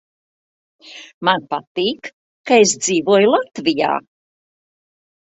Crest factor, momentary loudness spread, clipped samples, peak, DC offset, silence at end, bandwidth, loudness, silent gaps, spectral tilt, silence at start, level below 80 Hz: 20 dB; 21 LU; under 0.1%; 0 dBFS; under 0.1%; 1.25 s; 8.2 kHz; -17 LUFS; 1.14-1.21 s, 1.67-1.75 s, 2.13-2.44 s; -3 dB/octave; 0.85 s; -64 dBFS